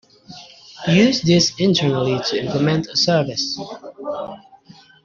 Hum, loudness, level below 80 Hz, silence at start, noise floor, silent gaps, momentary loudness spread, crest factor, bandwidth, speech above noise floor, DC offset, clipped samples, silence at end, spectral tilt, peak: none; -18 LUFS; -54 dBFS; 0.3 s; -47 dBFS; none; 19 LU; 18 dB; 7.4 kHz; 30 dB; under 0.1%; under 0.1%; 0.65 s; -5 dB/octave; -2 dBFS